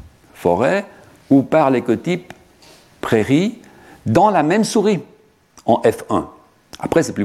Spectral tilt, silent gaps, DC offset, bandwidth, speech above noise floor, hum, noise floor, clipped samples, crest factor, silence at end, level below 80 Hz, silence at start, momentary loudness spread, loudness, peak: -6 dB/octave; none; under 0.1%; 14.5 kHz; 34 dB; none; -50 dBFS; under 0.1%; 18 dB; 0 s; -52 dBFS; 0.4 s; 12 LU; -17 LUFS; 0 dBFS